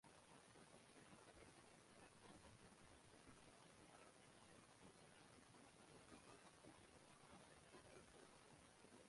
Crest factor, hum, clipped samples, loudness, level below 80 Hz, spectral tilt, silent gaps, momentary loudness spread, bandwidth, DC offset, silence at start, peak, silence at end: 16 dB; none; under 0.1%; -67 LUFS; -84 dBFS; -3.5 dB/octave; none; 2 LU; 11.5 kHz; under 0.1%; 0.05 s; -52 dBFS; 0 s